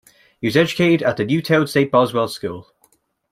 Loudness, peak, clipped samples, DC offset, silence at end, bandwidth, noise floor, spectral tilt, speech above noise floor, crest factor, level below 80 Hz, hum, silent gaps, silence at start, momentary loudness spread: -18 LUFS; -2 dBFS; under 0.1%; under 0.1%; 0.7 s; 16 kHz; -61 dBFS; -6 dB/octave; 43 dB; 18 dB; -58 dBFS; none; none; 0.4 s; 11 LU